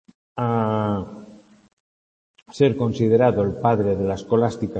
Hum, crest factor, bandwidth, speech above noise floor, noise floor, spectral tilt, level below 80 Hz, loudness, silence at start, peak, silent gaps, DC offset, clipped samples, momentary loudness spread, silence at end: none; 18 dB; 8.6 kHz; 25 dB; -45 dBFS; -8 dB/octave; -56 dBFS; -21 LUFS; 0.35 s; -4 dBFS; 1.73-2.34 s; under 0.1%; under 0.1%; 11 LU; 0 s